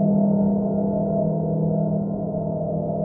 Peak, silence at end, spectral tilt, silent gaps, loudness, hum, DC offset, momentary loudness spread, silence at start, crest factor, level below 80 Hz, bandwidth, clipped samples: -10 dBFS; 0 s; -16.5 dB/octave; none; -23 LUFS; none; under 0.1%; 6 LU; 0 s; 12 dB; -48 dBFS; 1.5 kHz; under 0.1%